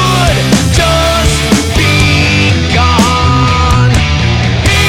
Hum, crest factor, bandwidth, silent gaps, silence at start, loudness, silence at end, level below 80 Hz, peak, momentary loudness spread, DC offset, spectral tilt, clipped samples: none; 8 dB; 17 kHz; none; 0 s; -9 LUFS; 0 s; -18 dBFS; 0 dBFS; 2 LU; under 0.1%; -4.5 dB/octave; under 0.1%